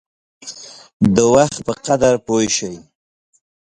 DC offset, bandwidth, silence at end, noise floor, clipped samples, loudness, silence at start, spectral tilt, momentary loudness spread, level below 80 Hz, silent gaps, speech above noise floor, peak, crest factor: under 0.1%; 11 kHz; 0.9 s; -36 dBFS; under 0.1%; -16 LUFS; 0.45 s; -4.5 dB/octave; 23 LU; -48 dBFS; 0.93-1.00 s; 21 dB; 0 dBFS; 18 dB